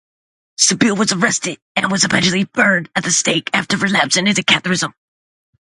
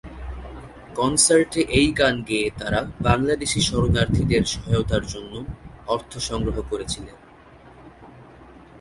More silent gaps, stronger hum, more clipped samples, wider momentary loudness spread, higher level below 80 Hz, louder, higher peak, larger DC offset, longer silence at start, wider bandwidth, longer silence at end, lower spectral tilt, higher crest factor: first, 1.62-1.75 s vs none; neither; neither; second, 7 LU vs 19 LU; second, -56 dBFS vs -36 dBFS; first, -15 LUFS vs -21 LUFS; about the same, 0 dBFS vs -2 dBFS; neither; first, 0.6 s vs 0.05 s; about the same, 11.5 kHz vs 11.5 kHz; first, 0.85 s vs 0 s; second, -2.5 dB/octave vs -4 dB/octave; about the same, 18 dB vs 22 dB